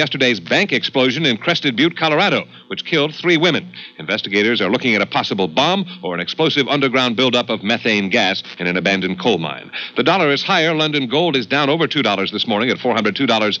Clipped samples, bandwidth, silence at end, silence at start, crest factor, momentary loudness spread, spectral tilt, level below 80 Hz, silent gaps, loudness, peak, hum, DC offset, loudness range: under 0.1%; 7.8 kHz; 0 s; 0 s; 16 dB; 7 LU; -5 dB/octave; -70 dBFS; none; -16 LUFS; -2 dBFS; none; under 0.1%; 1 LU